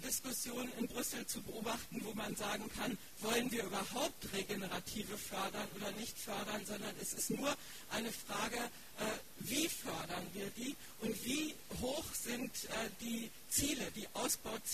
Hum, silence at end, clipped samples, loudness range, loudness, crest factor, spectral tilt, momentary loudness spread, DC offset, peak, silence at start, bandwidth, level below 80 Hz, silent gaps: none; 0 s; under 0.1%; 2 LU; -41 LUFS; 20 dB; -2.5 dB/octave; 6 LU; 0.2%; -22 dBFS; 0 s; 14.5 kHz; -64 dBFS; none